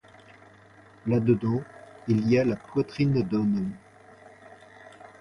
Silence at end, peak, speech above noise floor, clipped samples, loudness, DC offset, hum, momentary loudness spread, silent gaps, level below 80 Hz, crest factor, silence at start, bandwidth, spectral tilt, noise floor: 0.15 s; -10 dBFS; 29 dB; under 0.1%; -26 LUFS; under 0.1%; none; 21 LU; none; -58 dBFS; 18 dB; 1.05 s; 10.5 kHz; -9 dB/octave; -53 dBFS